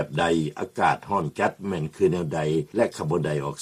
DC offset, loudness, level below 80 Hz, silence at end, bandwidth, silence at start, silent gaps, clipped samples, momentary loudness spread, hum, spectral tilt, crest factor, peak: under 0.1%; -25 LUFS; -54 dBFS; 0 s; 13.5 kHz; 0 s; none; under 0.1%; 4 LU; none; -6.5 dB/octave; 16 dB; -8 dBFS